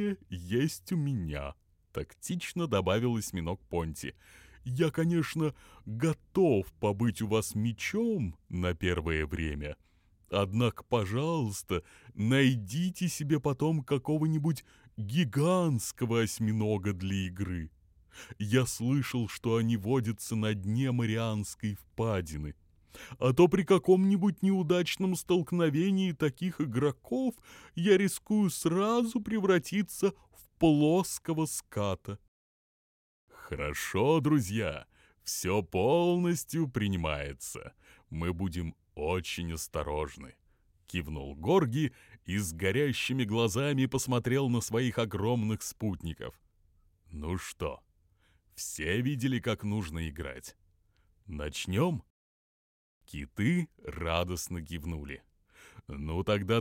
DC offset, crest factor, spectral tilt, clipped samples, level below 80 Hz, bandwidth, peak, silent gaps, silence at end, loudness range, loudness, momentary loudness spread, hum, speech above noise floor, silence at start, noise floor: under 0.1%; 20 dB; -6 dB/octave; under 0.1%; -52 dBFS; 16.5 kHz; -12 dBFS; 32.28-33.28 s, 52.10-53.01 s; 0 s; 7 LU; -31 LUFS; 14 LU; none; 38 dB; 0 s; -68 dBFS